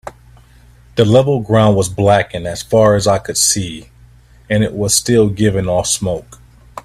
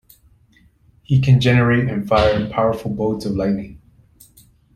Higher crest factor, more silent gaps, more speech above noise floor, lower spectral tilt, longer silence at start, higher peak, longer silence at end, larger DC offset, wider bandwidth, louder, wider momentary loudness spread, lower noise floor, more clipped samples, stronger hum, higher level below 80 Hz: about the same, 14 dB vs 16 dB; neither; second, 31 dB vs 38 dB; second, -4.5 dB/octave vs -7.5 dB/octave; second, 0.05 s vs 1.1 s; about the same, 0 dBFS vs -2 dBFS; second, 0.05 s vs 1 s; neither; about the same, 15 kHz vs 14 kHz; first, -14 LUFS vs -18 LUFS; first, 12 LU vs 8 LU; second, -44 dBFS vs -54 dBFS; neither; first, 60 Hz at -40 dBFS vs none; about the same, -40 dBFS vs -40 dBFS